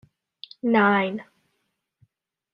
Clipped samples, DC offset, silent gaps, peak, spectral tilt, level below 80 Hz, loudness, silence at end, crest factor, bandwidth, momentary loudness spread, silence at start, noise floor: under 0.1%; under 0.1%; none; -6 dBFS; -8.5 dB/octave; -72 dBFS; -22 LUFS; 1.3 s; 20 dB; 5.4 kHz; 25 LU; 0.65 s; -76 dBFS